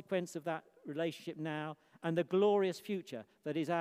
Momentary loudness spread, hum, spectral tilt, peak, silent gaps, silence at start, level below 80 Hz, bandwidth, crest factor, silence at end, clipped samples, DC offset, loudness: 14 LU; none; -6 dB/octave; -20 dBFS; none; 0.1 s; -88 dBFS; 15.5 kHz; 18 dB; 0 s; under 0.1%; under 0.1%; -37 LUFS